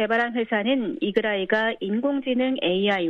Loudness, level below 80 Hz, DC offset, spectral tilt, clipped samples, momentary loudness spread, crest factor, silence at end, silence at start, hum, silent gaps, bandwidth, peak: -24 LUFS; -66 dBFS; under 0.1%; -7 dB/octave; under 0.1%; 2 LU; 16 dB; 0 s; 0 s; none; none; 7 kHz; -8 dBFS